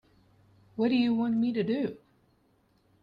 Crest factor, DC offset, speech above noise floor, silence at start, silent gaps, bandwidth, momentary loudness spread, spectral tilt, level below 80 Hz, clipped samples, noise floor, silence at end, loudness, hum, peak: 14 dB; under 0.1%; 41 dB; 0.75 s; none; 5.2 kHz; 8 LU; -8.5 dB/octave; -70 dBFS; under 0.1%; -68 dBFS; 1.05 s; -28 LUFS; none; -16 dBFS